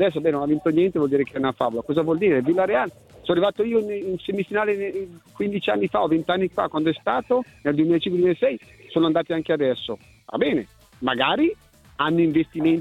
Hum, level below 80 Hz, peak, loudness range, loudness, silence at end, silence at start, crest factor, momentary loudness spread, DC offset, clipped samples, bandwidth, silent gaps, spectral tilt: none; -56 dBFS; -6 dBFS; 2 LU; -22 LUFS; 0 s; 0 s; 16 dB; 9 LU; under 0.1%; under 0.1%; 9 kHz; none; -7.5 dB/octave